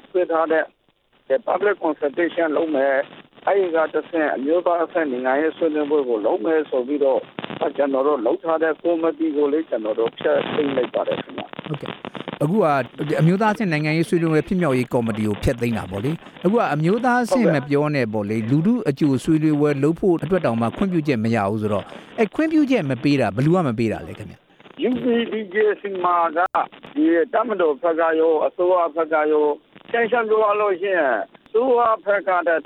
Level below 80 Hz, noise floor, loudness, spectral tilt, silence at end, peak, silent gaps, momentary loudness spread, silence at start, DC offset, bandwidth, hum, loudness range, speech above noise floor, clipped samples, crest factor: -50 dBFS; -62 dBFS; -20 LUFS; -7.5 dB/octave; 0.05 s; -6 dBFS; none; 7 LU; 0.15 s; under 0.1%; 14 kHz; none; 2 LU; 42 dB; under 0.1%; 14 dB